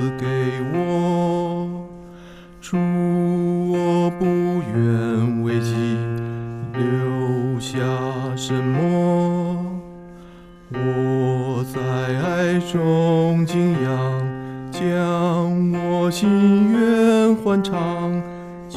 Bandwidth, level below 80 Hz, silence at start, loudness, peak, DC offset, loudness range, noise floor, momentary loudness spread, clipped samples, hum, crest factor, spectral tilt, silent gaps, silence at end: 13.5 kHz; -50 dBFS; 0 s; -20 LUFS; -6 dBFS; under 0.1%; 5 LU; -42 dBFS; 11 LU; under 0.1%; none; 14 dB; -7.5 dB/octave; none; 0 s